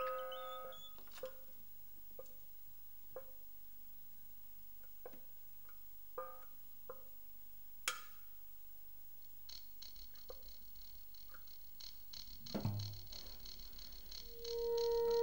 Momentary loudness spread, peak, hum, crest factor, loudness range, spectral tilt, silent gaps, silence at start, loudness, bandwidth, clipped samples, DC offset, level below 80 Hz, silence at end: 12 LU; -20 dBFS; none; 26 dB; 7 LU; -4 dB/octave; none; 0 s; -49 LUFS; 16 kHz; under 0.1%; 0.2%; -66 dBFS; 0 s